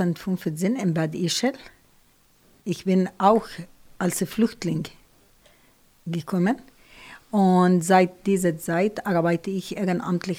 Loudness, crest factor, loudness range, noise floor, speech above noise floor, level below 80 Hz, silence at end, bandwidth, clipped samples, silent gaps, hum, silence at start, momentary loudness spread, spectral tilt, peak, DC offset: -23 LUFS; 18 dB; 6 LU; -59 dBFS; 36 dB; -60 dBFS; 0 s; 16 kHz; under 0.1%; none; none; 0 s; 13 LU; -6 dB/octave; -6 dBFS; under 0.1%